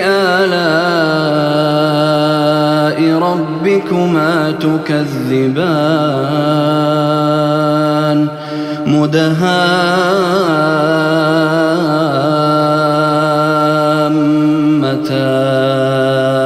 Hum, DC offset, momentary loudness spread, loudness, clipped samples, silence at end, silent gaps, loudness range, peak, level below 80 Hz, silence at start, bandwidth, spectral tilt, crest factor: none; under 0.1%; 3 LU; -12 LUFS; under 0.1%; 0 s; none; 1 LU; 0 dBFS; -58 dBFS; 0 s; 13.5 kHz; -6.5 dB/octave; 12 dB